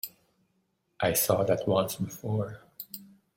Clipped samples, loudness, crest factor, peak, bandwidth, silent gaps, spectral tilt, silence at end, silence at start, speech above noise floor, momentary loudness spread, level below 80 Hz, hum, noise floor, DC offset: under 0.1%; -28 LUFS; 20 dB; -12 dBFS; 16.5 kHz; none; -4.5 dB/octave; 0.3 s; 0.05 s; 47 dB; 17 LU; -62 dBFS; none; -75 dBFS; under 0.1%